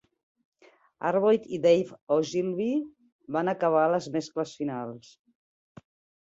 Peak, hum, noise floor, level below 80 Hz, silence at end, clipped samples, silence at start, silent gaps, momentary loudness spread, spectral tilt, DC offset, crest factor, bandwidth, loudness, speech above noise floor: -10 dBFS; none; -54 dBFS; -74 dBFS; 1.3 s; under 0.1%; 1 s; 2.02-2.07 s, 3.12-3.19 s; 11 LU; -6 dB/octave; under 0.1%; 18 dB; 7.8 kHz; -27 LUFS; 27 dB